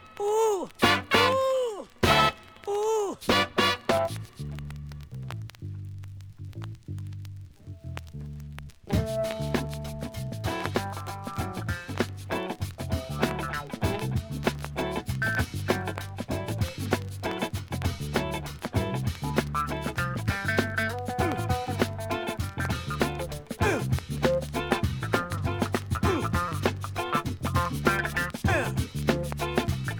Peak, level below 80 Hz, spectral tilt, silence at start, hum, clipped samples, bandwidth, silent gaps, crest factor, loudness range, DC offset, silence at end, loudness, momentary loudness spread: -6 dBFS; -44 dBFS; -5 dB/octave; 0 s; none; under 0.1%; over 20 kHz; none; 22 dB; 9 LU; under 0.1%; 0 s; -29 LUFS; 15 LU